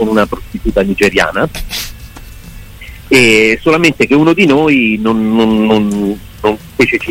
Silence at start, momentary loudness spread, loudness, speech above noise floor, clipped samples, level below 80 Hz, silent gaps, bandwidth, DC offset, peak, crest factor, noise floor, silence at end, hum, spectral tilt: 0 s; 11 LU; -11 LUFS; 20 dB; under 0.1%; -30 dBFS; none; 16.5 kHz; under 0.1%; 0 dBFS; 12 dB; -31 dBFS; 0 s; none; -5 dB/octave